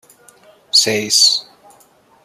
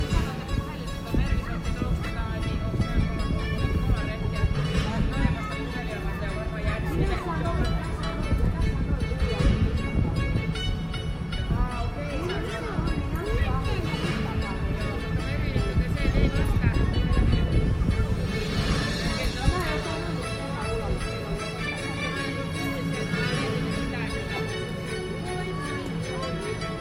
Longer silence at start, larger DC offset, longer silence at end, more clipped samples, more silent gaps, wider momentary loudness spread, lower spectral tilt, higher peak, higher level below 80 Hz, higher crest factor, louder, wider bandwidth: first, 0.75 s vs 0 s; neither; first, 0.8 s vs 0 s; neither; neither; about the same, 4 LU vs 6 LU; second, -0.5 dB/octave vs -6 dB/octave; first, 0 dBFS vs -8 dBFS; second, -68 dBFS vs -30 dBFS; about the same, 18 dB vs 18 dB; first, -12 LUFS vs -28 LUFS; about the same, 15 kHz vs 15.5 kHz